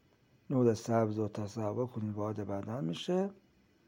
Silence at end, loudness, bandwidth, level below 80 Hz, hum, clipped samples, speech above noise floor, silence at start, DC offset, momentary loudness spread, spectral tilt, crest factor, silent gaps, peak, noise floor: 0.55 s; -35 LUFS; 16.5 kHz; -74 dBFS; none; under 0.1%; 31 dB; 0.5 s; under 0.1%; 8 LU; -7 dB/octave; 18 dB; none; -16 dBFS; -65 dBFS